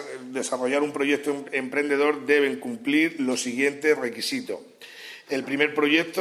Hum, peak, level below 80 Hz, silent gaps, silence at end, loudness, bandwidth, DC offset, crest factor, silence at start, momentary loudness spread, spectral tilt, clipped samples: none; -4 dBFS; -78 dBFS; none; 0 s; -24 LUFS; 14 kHz; under 0.1%; 20 dB; 0 s; 13 LU; -3 dB/octave; under 0.1%